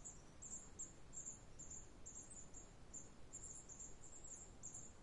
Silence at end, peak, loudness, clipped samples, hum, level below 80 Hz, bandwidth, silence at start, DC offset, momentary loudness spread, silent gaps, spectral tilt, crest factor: 0 s; -40 dBFS; -55 LUFS; under 0.1%; none; -66 dBFS; 11 kHz; 0 s; under 0.1%; 5 LU; none; -3 dB/octave; 16 dB